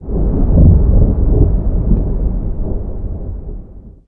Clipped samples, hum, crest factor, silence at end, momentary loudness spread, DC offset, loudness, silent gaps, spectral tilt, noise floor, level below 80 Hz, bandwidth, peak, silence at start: under 0.1%; none; 12 dB; 0.15 s; 17 LU; under 0.1%; -15 LUFS; none; -15.5 dB/octave; -33 dBFS; -14 dBFS; 1.7 kHz; 0 dBFS; 0 s